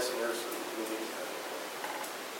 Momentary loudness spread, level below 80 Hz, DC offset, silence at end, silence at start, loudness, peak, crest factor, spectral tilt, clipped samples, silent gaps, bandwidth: 4 LU; under -90 dBFS; under 0.1%; 0 s; 0 s; -37 LUFS; -22 dBFS; 16 dB; -1.5 dB/octave; under 0.1%; none; 16.5 kHz